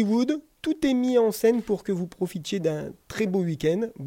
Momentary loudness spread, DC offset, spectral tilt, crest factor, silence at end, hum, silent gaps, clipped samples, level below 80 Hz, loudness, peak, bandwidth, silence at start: 9 LU; under 0.1%; -6.5 dB/octave; 14 dB; 0 s; none; none; under 0.1%; -56 dBFS; -25 LUFS; -10 dBFS; 17 kHz; 0 s